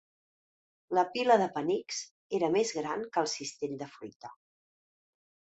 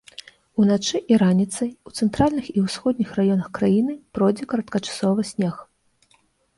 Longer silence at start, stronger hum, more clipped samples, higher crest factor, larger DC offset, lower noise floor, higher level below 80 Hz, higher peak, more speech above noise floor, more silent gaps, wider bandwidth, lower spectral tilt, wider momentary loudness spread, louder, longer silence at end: first, 0.9 s vs 0.55 s; neither; neither; about the same, 22 dB vs 18 dB; neither; first, under -90 dBFS vs -62 dBFS; second, -78 dBFS vs -52 dBFS; second, -10 dBFS vs -4 dBFS; first, over 59 dB vs 41 dB; first, 2.11-2.30 s, 4.16-4.20 s vs none; second, 8.2 kHz vs 11.5 kHz; second, -3.5 dB/octave vs -6 dB/octave; first, 19 LU vs 9 LU; second, -31 LUFS vs -22 LUFS; first, 1.25 s vs 0.95 s